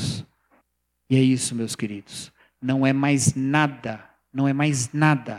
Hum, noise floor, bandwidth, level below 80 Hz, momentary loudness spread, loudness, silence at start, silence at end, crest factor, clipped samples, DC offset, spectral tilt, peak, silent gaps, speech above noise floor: none; -72 dBFS; 14.5 kHz; -58 dBFS; 15 LU; -22 LUFS; 0 s; 0 s; 20 dB; under 0.1%; under 0.1%; -5 dB/octave; -4 dBFS; none; 50 dB